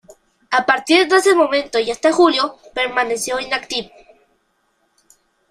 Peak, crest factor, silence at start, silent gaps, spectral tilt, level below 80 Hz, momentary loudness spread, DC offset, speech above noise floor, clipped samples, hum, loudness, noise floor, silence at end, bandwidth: -2 dBFS; 16 dB; 0.5 s; none; -2 dB/octave; -56 dBFS; 9 LU; under 0.1%; 48 dB; under 0.1%; none; -16 LUFS; -65 dBFS; 1.65 s; 15 kHz